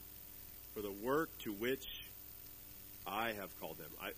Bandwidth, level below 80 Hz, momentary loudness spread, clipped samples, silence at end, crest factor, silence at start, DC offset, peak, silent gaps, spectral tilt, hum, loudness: 15 kHz; -64 dBFS; 13 LU; under 0.1%; 0 s; 20 dB; 0 s; under 0.1%; -24 dBFS; none; -4 dB/octave; 60 Hz at -65 dBFS; -44 LUFS